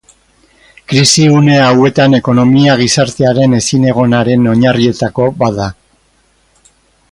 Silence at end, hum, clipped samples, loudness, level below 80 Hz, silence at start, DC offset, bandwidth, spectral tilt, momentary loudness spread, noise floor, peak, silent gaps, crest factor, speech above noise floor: 1.4 s; none; under 0.1%; -9 LUFS; -42 dBFS; 0.9 s; under 0.1%; 11.5 kHz; -5 dB/octave; 7 LU; -53 dBFS; 0 dBFS; none; 10 dB; 44 dB